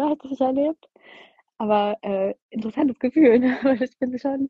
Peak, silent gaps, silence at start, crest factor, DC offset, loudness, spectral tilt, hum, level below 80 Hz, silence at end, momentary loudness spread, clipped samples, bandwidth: -6 dBFS; 2.42-2.49 s; 0 s; 16 dB; under 0.1%; -22 LUFS; -8 dB/octave; none; -62 dBFS; 0 s; 12 LU; under 0.1%; 6 kHz